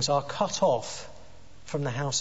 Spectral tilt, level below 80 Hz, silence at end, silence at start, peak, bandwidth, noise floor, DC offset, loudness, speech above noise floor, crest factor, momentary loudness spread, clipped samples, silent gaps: -3.5 dB/octave; -58 dBFS; 0 s; 0 s; -12 dBFS; 8 kHz; -52 dBFS; 0.7%; -28 LUFS; 25 dB; 18 dB; 14 LU; under 0.1%; none